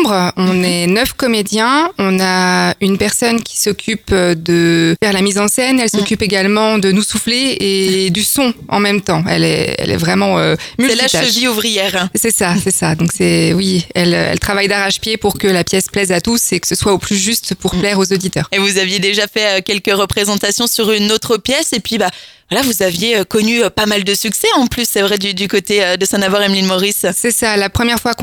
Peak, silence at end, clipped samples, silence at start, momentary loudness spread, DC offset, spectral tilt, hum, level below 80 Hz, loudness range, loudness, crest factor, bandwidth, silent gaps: 0 dBFS; 0 s; under 0.1%; 0 s; 3 LU; under 0.1%; -3.5 dB/octave; none; -40 dBFS; 1 LU; -13 LUFS; 14 dB; 19.5 kHz; none